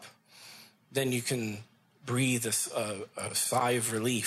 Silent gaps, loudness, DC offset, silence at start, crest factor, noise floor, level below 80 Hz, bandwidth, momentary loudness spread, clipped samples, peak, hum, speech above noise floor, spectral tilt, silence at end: none; -31 LUFS; under 0.1%; 0 s; 18 dB; -54 dBFS; -72 dBFS; 15.5 kHz; 19 LU; under 0.1%; -14 dBFS; none; 23 dB; -3.5 dB/octave; 0 s